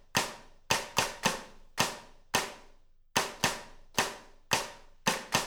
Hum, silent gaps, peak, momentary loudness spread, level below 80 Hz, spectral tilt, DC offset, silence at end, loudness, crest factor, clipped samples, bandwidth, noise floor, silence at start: none; none; -8 dBFS; 14 LU; -56 dBFS; -1.5 dB/octave; under 0.1%; 0 s; -32 LUFS; 26 dB; under 0.1%; over 20 kHz; -57 dBFS; 0.15 s